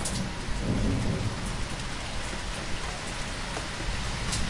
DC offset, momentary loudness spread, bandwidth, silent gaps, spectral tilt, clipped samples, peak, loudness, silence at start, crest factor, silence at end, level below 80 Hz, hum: 0.1%; 5 LU; 11.5 kHz; none; -4 dB/octave; under 0.1%; -16 dBFS; -32 LUFS; 0 s; 14 dB; 0 s; -36 dBFS; none